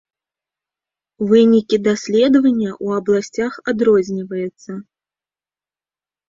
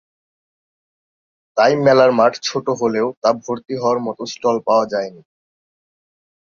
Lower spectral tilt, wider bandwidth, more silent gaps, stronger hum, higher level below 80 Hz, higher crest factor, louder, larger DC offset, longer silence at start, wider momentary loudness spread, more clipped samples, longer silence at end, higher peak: about the same, -6 dB/octave vs -5 dB/octave; about the same, 7.6 kHz vs 7.4 kHz; second, none vs 3.17-3.22 s; neither; first, -58 dBFS vs -64 dBFS; about the same, 16 dB vs 18 dB; about the same, -16 LUFS vs -17 LUFS; neither; second, 1.2 s vs 1.55 s; about the same, 13 LU vs 12 LU; neither; about the same, 1.45 s vs 1.35 s; about the same, -2 dBFS vs -2 dBFS